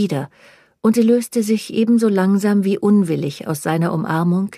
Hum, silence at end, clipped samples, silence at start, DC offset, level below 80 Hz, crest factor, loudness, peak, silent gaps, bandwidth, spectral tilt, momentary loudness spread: none; 0 s; under 0.1%; 0 s; under 0.1%; -64 dBFS; 12 dB; -17 LUFS; -4 dBFS; none; 15 kHz; -7 dB/octave; 8 LU